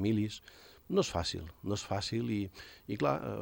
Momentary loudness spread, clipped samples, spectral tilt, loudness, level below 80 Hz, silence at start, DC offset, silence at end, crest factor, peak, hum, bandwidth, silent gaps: 11 LU; under 0.1%; -5.5 dB/octave; -35 LUFS; -58 dBFS; 0 s; under 0.1%; 0 s; 18 dB; -16 dBFS; none; 17 kHz; none